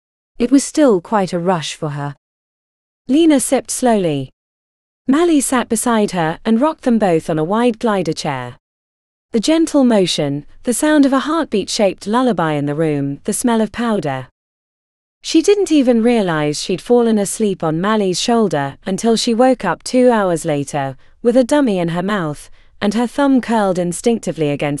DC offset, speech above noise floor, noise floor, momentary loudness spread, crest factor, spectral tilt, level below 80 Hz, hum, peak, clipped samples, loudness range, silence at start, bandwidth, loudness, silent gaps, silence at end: under 0.1%; over 75 dB; under -90 dBFS; 9 LU; 16 dB; -5 dB/octave; -46 dBFS; none; 0 dBFS; under 0.1%; 2 LU; 0.4 s; 13.5 kHz; -16 LUFS; 2.18-3.05 s, 4.33-5.05 s, 8.60-9.29 s, 14.31-15.21 s; 0 s